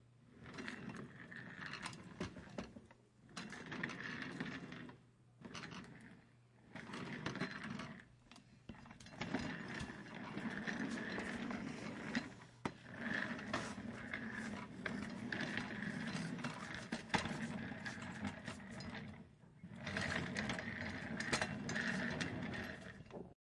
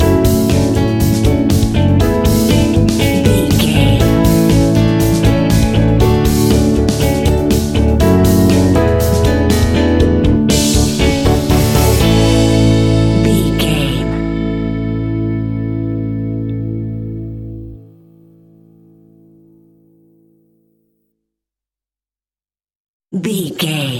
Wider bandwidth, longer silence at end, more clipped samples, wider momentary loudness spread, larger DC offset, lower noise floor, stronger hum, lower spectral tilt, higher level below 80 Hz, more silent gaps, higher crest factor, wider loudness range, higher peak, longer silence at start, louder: second, 12 kHz vs 17 kHz; about the same, 0.1 s vs 0 s; neither; first, 16 LU vs 9 LU; neither; second, -67 dBFS vs under -90 dBFS; neither; second, -4.5 dB/octave vs -6 dB/octave; second, -70 dBFS vs -22 dBFS; second, none vs 22.76-23.00 s; first, 26 dB vs 12 dB; second, 8 LU vs 12 LU; second, -20 dBFS vs 0 dBFS; about the same, 0 s vs 0 s; second, -45 LUFS vs -13 LUFS